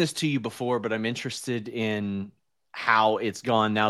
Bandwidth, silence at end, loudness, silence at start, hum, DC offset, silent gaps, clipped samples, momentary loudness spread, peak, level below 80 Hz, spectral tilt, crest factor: 12.5 kHz; 0 s; -27 LUFS; 0 s; none; under 0.1%; none; under 0.1%; 11 LU; -6 dBFS; -70 dBFS; -5 dB/octave; 22 dB